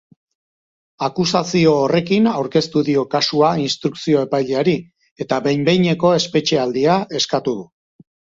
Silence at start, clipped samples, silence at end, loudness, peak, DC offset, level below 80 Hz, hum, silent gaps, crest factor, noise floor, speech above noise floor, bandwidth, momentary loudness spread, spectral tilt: 1 s; under 0.1%; 0.7 s; -17 LUFS; 0 dBFS; under 0.1%; -56 dBFS; none; 5.11-5.16 s; 18 dB; under -90 dBFS; over 73 dB; 7.8 kHz; 7 LU; -5.5 dB/octave